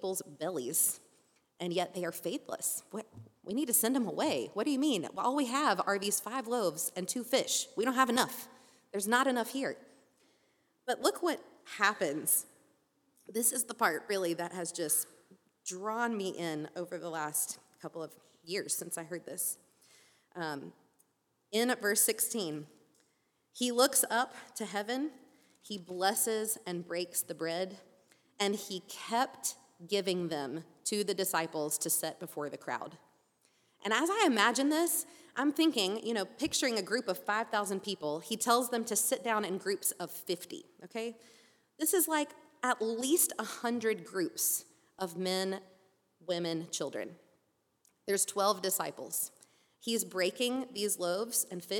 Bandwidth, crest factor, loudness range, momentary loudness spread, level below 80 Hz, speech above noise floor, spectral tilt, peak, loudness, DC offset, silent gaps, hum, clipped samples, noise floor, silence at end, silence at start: 19.5 kHz; 24 dB; 5 LU; 13 LU; -84 dBFS; 44 dB; -2 dB/octave; -10 dBFS; -33 LUFS; under 0.1%; none; none; under 0.1%; -77 dBFS; 0 s; 0 s